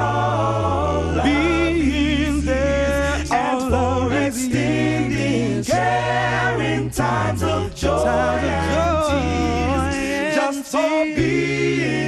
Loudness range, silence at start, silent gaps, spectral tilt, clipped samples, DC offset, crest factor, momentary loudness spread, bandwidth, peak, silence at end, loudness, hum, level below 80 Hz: 1 LU; 0 s; none; -5.5 dB/octave; under 0.1%; under 0.1%; 14 dB; 3 LU; 13 kHz; -4 dBFS; 0 s; -20 LUFS; none; -32 dBFS